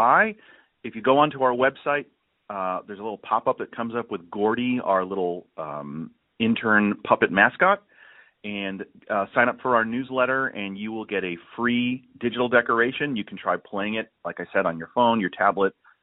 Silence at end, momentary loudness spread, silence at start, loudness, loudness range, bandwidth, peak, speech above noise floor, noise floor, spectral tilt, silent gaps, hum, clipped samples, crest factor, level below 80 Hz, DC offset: 0.3 s; 14 LU; 0 s; -24 LUFS; 4 LU; 4.1 kHz; -2 dBFS; 29 dB; -53 dBFS; -3 dB/octave; none; none; under 0.1%; 22 dB; -66 dBFS; under 0.1%